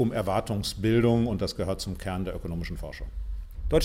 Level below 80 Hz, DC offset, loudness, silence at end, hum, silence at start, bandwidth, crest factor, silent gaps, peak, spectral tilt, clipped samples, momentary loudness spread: -38 dBFS; under 0.1%; -29 LUFS; 0 s; none; 0 s; 16.5 kHz; 16 dB; none; -10 dBFS; -6.5 dB/octave; under 0.1%; 15 LU